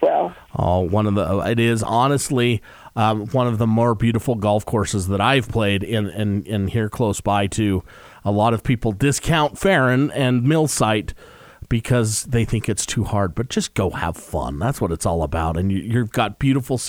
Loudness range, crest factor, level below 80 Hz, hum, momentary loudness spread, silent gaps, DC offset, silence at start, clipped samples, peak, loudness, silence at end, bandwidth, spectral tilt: 3 LU; 16 dB; -38 dBFS; none; 6 LU; none; under 0.1%; 0 s; under 0.1%; -4 dBFS; -20 LUFS; 0 s; 19.5 kHz; -5.5 dB/octave